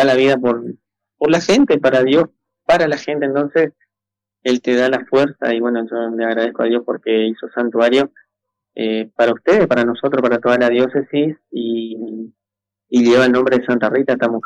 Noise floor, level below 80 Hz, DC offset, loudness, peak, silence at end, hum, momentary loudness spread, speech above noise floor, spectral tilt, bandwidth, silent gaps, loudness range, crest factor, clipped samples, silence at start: -86 dBFS; -58 dBFS; under 0.1%; -16 LUFS; -6 dBFS; 0.05 s; none; 11 LU; 70 dB; -5.5 dB/octave; 10 kHz; none; 2 LU; 10 dB; under 0.1%; 0 s